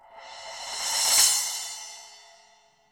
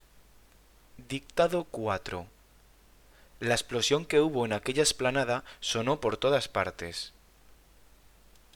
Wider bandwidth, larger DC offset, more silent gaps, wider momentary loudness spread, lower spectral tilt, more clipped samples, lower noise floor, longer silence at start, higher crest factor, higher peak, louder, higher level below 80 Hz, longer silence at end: about the same, over 20 kHz vs 19.5 kHz; neither; neither; first, 24 LU vs 13 LU; second, 3.5 dB/octave vs -3.5 dB/octave; neither; about the same, -60 dBFS vs -59 dBFS; second, 0.1 s vs 0.95 s; about the same, 24 dB vs 22 dB; first, -4 dBFS vs -10 dBFS; first, -22 LUFS vs -29 LUFS; second, -66 dBFS vs -56 dBFS; second, 0.7 s vs 1 s